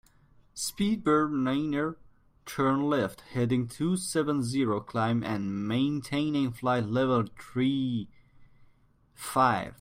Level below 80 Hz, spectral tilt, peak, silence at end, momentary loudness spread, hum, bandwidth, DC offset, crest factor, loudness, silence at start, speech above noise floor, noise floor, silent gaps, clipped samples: -60 dBFS; -6 dB/octave; -10 dBFS; 0.05 s; 9 LU; none; 16 kHz; under 0.1%; 18 dB; -29 LUFS; 0.55 s; 35 dB; -63 dBFS; none; under 0.1%